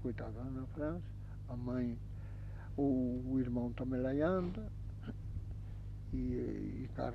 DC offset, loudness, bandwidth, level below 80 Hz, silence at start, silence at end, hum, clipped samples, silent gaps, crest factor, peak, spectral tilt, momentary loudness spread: under 0.1%; -40 LUFS; 6.2 kHz; -48 dBFS; 0 s; 0 s; 50 Hz at -45 dBFS; under 0.1%; none; 18 dB; -20 dBFS; -10 dB/octave; 13 LU